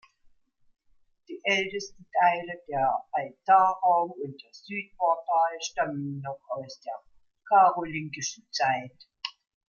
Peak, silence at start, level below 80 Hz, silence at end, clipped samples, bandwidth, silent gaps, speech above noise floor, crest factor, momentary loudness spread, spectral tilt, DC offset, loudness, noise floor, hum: -8 dBFS; 1.3 s; -70 dBFS; 0.45 s; under 0.1%; 7.2 kHz; none; 37 dB; 20 dB; 18 LU; -3.5 dB/octave; under 0.1%; -27 LUFS; -64 dBFS; none